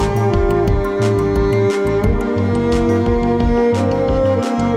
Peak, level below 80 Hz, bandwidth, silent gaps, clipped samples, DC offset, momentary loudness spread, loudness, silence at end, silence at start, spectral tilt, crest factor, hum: -4 dBFS; -24 dBFS; 14 kHz; none; under 0.1%; under 0.1%; 2 LU; -16 LUFS; 0 s; 0 s; -7.5 dB/octave; 12 dB; none